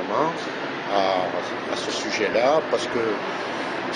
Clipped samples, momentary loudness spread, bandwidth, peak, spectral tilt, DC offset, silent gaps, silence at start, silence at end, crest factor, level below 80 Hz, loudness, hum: under 0.1%; 7 LU; 10 kHz; -6 dBFS; -3.5 dB/octave; under 0.1%; none; 0 s; 0 s; 18 dB; -64 dBFS; -24 LUFS; none